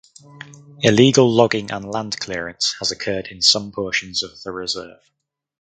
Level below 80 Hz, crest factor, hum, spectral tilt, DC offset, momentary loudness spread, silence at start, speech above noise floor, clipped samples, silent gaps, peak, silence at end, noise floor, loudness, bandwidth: -54 dBFS; 20 dB; none; -4 dB/octave; under 0.1%; 13 LU; 0.35 s; 22 dB; under 0.1%; none; 0 dBFS; 0.7 s; -41 dBFS; -18 LUFS; 9.4 kHz